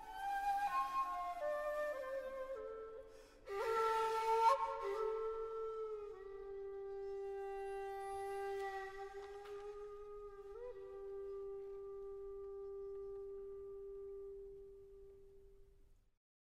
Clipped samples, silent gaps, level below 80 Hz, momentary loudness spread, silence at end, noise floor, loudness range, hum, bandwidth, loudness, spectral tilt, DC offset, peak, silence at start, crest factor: under 0.1%; none; -66 dBFS; 16 LU; 0.45 s; -67 dBFS; 12 LU; none; 16 kHz; -43 LUFS; -3.5 dB/octave; under 0.1%; -22 dBFS; 0 s; 22 dB